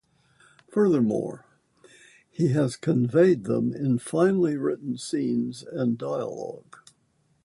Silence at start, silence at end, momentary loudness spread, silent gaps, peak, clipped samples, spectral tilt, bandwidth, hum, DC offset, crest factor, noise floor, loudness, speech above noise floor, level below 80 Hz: 0.7 s; 0.85 s; 14 LU; none; -8 dBFS; under 0.1%; -7.5 dB/octave; 11.5 kHz; none; under 0.1%; 18 dB; -68 dBFS; -25 LUFS; 43 dB; -66 dBFS